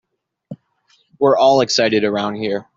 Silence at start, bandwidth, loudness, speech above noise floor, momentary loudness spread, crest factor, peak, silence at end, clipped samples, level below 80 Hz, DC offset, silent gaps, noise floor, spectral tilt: 0.5 s; 7.8 kHz; -16 LUFS; 44 dB; 8 LU; 16 dB; -2 dBFS; 0.15 s; under 0.1%; -62 dBFS; under 0.1%; none; -60 dBFS; -4 dB/octave